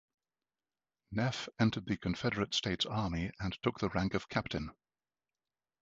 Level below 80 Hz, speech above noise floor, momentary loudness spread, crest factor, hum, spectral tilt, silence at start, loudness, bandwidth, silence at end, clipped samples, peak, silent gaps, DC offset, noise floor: -54 dBFS; over 55 dB; 6 LU; 22 dB; none; -5.5 dB/octave; 1.1 s; -35 LUFS; 8 kHz; 1.1 s; under 0.1%; -16 dBFS; none; under 0.1%; under -90 dBFS